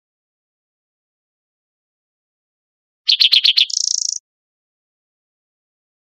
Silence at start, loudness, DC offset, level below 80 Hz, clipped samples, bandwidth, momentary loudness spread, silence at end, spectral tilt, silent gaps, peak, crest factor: 3.05 s; -13 LUFS; under 0.1%; under -90 dBFS; under 0.1%; 13.5 kHz; 12 LU; 1.95 s; 14.5 dB/octave; none; -2 dBFS; 22 dB